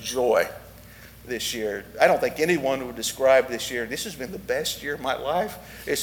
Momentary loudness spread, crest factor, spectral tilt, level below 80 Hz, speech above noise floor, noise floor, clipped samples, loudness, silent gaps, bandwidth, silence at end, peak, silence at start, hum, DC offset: 12 LU; 22 dB; -3 dB/octave; -52 dBFS; 21 dB; -46 dBFS; under 0.1%; -25 LUFS; none; over 20 kHz; 0 s; -4 dBFS; 0 s; none; under 0.1%